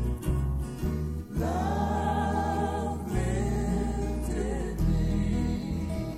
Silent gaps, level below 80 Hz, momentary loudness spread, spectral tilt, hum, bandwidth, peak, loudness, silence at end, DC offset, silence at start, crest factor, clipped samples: none; -34 dBFS; 4 LU; -7 dB/octave; none; 15 kHz; -16 dBFS; -30 LUFS; 0 s; under 0.1%; 0 s; 12 dB; under 0.1%